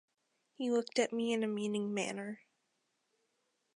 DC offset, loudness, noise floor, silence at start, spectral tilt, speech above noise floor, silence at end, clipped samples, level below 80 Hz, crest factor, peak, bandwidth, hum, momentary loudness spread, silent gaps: under 0.1%; -36 LUFS; -82 dBFS; 0.6 s; -4.5 dB/octave; 46 dB; 1.4 s; under 0.1%; -90 dBFS; 20 dB; -18 dBFS; 11 kHz; none; 10 LU; none